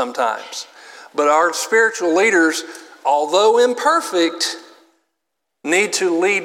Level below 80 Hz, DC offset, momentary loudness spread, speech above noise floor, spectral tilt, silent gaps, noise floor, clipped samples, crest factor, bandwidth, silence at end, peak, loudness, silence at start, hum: -86 dBFS; under 0.1%; 16 LU; 61 dB; -1.5 dB/octave; none; -78 dBFS; under 0.1%; 16 dB; 16.5 kHz; 0 s; -2 dBFS; -17 LUFS; 0 s; none